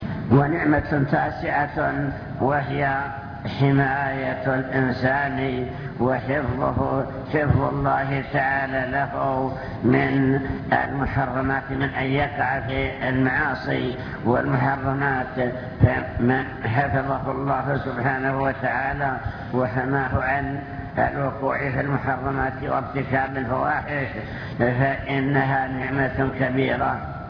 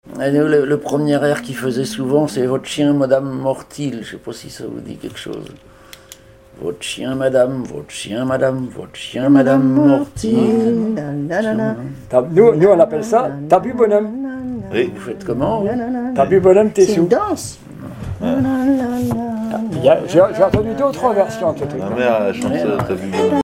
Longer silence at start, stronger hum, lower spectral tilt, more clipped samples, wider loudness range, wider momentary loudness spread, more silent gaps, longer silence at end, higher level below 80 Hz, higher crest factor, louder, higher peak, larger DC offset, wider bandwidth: about the same, 0 s vs 0.05 s; neither; first, -9.5 dB/octave vs -6.5 dB/octave; neither; second, 2 LU vs 8 LU; second, 6 LU vs 16 LU; neither; about the same, 0 s vs 0 s; first, -40 dBFS vs -46 dBFS; about the same, 18 dB vs 16 dB; second, -23 LUFS vs -16 LUFS; second, -4 dBFS vs 0 dBFS; neither; second, 5.4 kHz vs 16 kHz